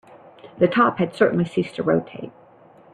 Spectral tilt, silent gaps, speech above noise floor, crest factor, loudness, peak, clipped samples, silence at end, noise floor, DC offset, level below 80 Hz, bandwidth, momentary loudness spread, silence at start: -8 dB/octave; none; 29 dB; 18 dB; -21 LUFS; -4 dBFS; under 0.1%; 0.65 s; -50 dBFS; under 0.1%; -60 dBFS; 10 kHz; 19 LU; 0.45 s